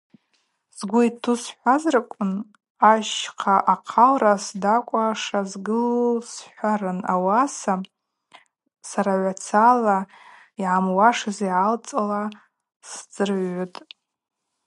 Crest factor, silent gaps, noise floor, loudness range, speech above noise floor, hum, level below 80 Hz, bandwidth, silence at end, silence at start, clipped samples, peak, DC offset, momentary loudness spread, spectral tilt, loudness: 20 dB; 2.70-2.75 s, 12.76-12.80 s; -70 dBFS; 5 LU; 49 dB; none; -76 dBFS; 11.5 kHz; 1 s; 0.75 s; under 0.1%; -2 dBFS; under 0.1%; 15 LU; -5 dB/octave; -21 LUFS